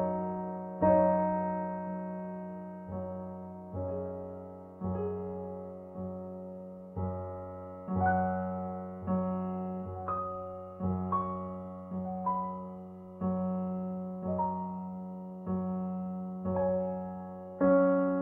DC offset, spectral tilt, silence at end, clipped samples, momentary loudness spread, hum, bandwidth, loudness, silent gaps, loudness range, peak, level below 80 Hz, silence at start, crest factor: under 0.1%; -12 dB/octave; 0 s; under 0.1%; 15 LU; none; 3 kHz; -34 LUFS; none; 7 LU; -14 dBFS; -62 dBFS; 0 s; 20 dB